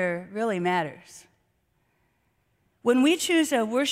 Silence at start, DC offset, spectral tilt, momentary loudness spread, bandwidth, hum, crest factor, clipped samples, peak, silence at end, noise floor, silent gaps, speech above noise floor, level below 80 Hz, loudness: 0 s; under 0.1%; -4 dB/octave; 8 LU; 16 kHz; none; 16 dB; under 0.1%; -10 dBFS; 0 s; -71 dBFS; none; 46 dB; -70 dBFS; -24 LUFS